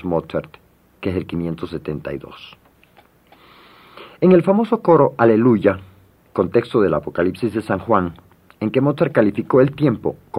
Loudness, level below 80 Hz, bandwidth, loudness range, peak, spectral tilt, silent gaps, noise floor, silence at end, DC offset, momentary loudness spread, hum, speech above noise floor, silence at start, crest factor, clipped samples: -18 LUFS; -54 dBFS; 11.5 kHz; 13 LU; 0 dBFS; -9 dB/octave; none; -52 dBFS; 0 s; under 0.1%; 14 LU; none; 35 dB; 0.05 s; 18 dB; under 0.1%